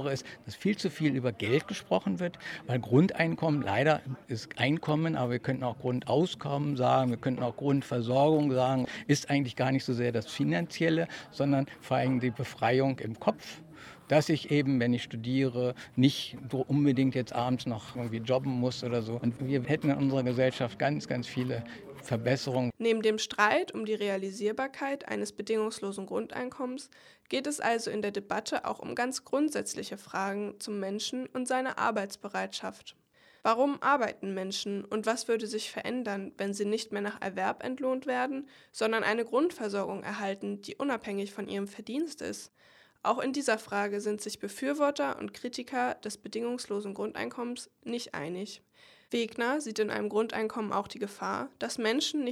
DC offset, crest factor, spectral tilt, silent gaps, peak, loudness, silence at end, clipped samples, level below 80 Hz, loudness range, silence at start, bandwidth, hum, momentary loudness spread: under 0.1%; 22 dB; -5.5 dB/octave; none; -10 dBFS; -31 LUFS; 0 s; under 0.1%; -70 dBFS; 5 LU; 0 s; 15 kHz; none; 10 LU